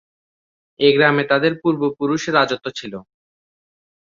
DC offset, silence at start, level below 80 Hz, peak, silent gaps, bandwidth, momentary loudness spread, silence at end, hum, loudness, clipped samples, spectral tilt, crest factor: under 0.1%; 0.8 s; -62 dBFS; -2 dBFS; none; 7.4 kHz; 16 LU; 1.15 s; none; -17 LUFS; under 0.1%; -5 dB/octave; 18 dB